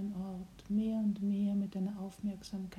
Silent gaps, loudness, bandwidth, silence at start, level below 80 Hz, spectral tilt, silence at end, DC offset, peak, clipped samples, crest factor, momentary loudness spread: none; -36 LUFS; 12 kHz; 0 s; -62 dBFS; -8 dB/octave; 0 s; under 0.1%; -24 dBFS; under 0.1%; 12 dB; 9 LU